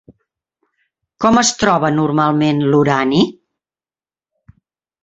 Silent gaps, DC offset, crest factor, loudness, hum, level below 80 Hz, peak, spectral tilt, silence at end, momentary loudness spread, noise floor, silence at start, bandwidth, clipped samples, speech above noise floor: none; under 0.1%; 16 dB; -14 LUFS; none; -50 dBFS; 0 dBFS; -5 dB/octave; 1.7 s; 4 LU; under -90 dBFS; 1.2 s; 8.2 kHz; under 0.1%; over 77 dB